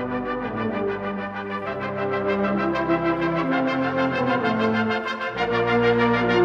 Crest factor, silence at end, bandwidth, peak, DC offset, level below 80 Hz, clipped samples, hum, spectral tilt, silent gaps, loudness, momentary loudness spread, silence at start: 16 dB; 0 s; 7.6 kHz; -8 dBFS; under 0.1%; -50 dBFS; under 0.1%; none; -7 dB/octave; none; -23 LUFS; 9 LU; 0 s